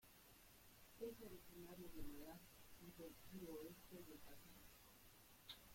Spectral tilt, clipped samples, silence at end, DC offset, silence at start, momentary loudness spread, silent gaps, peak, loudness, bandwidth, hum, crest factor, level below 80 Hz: -4.5 dB/octave; under 0.1%; 0 s; under 0.1%; 0 s; 11 LU; none; -40 dBFS; -60 LUFS; 16.5 kHz; none; 18 dB; -70 dBFS